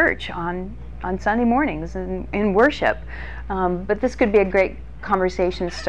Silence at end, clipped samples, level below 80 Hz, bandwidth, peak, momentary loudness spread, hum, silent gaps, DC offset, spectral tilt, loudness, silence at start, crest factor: 0 s; under 0.1%; -36 dBFS; 9.8 kHz; -6 dBFS; 13 LU; none; none; 1%; -6.5 dB/octave; -21 LUFS; 0 s; 16 dB